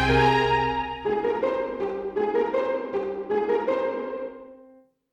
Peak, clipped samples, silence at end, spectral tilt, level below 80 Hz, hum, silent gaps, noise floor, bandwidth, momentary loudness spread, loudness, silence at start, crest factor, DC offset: -8 dBFS; under 0.1%; 0.5 s; -6.5 dB/octave; -44 dBFS; none; none; -55 dBFS; 9.8 kHz; 11 LU; -25 LUFS; 0 s; 18 dB; under 0.1%